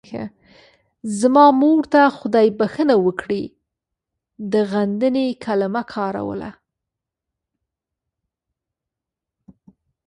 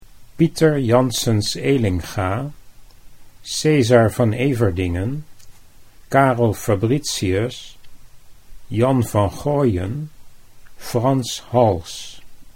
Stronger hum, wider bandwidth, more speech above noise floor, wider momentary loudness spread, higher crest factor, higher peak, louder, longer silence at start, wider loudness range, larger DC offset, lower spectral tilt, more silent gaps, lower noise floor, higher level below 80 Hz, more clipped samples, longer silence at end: neither; second, 11.5 kHz vs 16.5 kHz; first, 68 dB vs 24 dB; first, 19 LU vs 14 LU; about the same, 20 dB vs 20 dB; about the same, -2 dBFS vs 0 dBFS; about the same, -18 LUFS vs -19 LUFS; about the same, 0.1 s vs 0.1 s; first, 14 LU vs 3 LU; neither; about the same, -6 dB/octave vs -6 dB/octave; neither; first, -85 dBFS vs -42 dBFS; second, -60 dBFS vs -44 dBFS; neither; first, 3.55 s vs 0.05 s